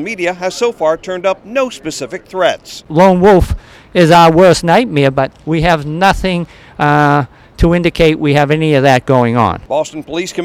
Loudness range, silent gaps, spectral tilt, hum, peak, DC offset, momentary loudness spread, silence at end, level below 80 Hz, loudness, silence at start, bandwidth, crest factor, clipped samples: 3 LU; none; -6 dB/octave; none; 0 dBFS; under 0.1%; 12 LU; 0 s; -30 dBFS; -12 LUFS; 0 s; 16 kHz; 12 dB; under 0.1%